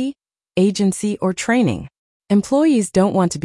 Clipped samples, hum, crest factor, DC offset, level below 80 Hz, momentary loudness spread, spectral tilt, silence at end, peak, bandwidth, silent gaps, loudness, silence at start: under 0.1%; none; 14 dB; under 0.1%; -52 dBFS; 7 LU; -6 dB/octave; 0.05 s; -4 dBFS; 12 kHz; 1.98-2.20 s; -18 LUFS; 0 s